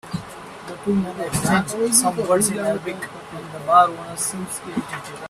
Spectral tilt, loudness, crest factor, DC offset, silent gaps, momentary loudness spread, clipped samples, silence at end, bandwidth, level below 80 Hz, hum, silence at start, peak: -4 dB/octave; -20 LUFS; 22 dB; under 0.1%; none; 17 LU; under 0.1%; 0 s; 15.5 kHz; -54 dBFS; none; 0.05 s; 0 dBFS